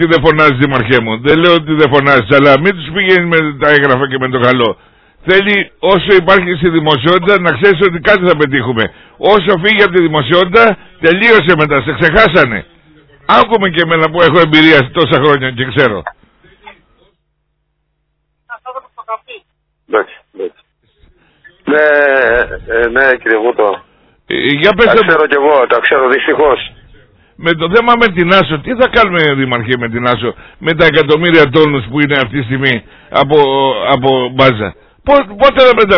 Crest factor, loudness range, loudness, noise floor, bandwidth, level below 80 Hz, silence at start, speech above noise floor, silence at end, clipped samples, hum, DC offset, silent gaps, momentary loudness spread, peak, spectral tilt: 10 dB; 8 LU; -9 LUFS; -64 dBFS; 5.4 kHz; -38 dBFS; 0 s; 55 dB; 0 s; 1%; none; under 0.1%; none; 10 LU; 0 dBFS; -7.5 dB/octave